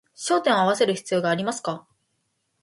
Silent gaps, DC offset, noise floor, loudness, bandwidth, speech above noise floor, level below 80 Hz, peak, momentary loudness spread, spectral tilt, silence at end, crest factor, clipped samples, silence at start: none; under 0.1%; -74 dBFS; -23 LUFS; 11.5 kHz; 51 dB; -72 dBFS; -8 dBFS; 11 LU; -4 dB/octave; 0.8 s; 18 dB; under 0.1%; 0.2 s